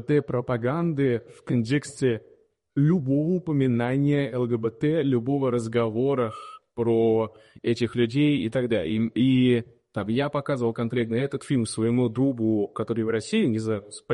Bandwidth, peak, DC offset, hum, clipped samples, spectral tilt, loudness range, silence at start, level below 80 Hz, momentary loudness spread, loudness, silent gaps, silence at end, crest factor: 11.5 kHz; -12 dBFS; under 0.1%; none; under 0.1%; -7 dB/octave; 2 LU; 0 s; -60 dBFS; 7 LU; -25 LUFS; none; 0 s; 14 dB